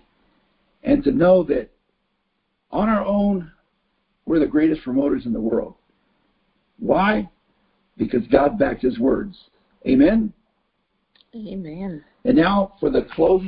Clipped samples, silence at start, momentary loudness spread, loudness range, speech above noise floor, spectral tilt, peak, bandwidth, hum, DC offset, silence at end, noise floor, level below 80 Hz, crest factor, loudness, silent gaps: under 0.1%; 0.85 s; 16 LU; 3 LU; 53 dB; -11.5 dB/octave; -2 dBFS; 5.2 kHz; none; under 0.1%; 0 s; -72 dBFS; -44 dBFS; 20 dB; -20 LUFS; none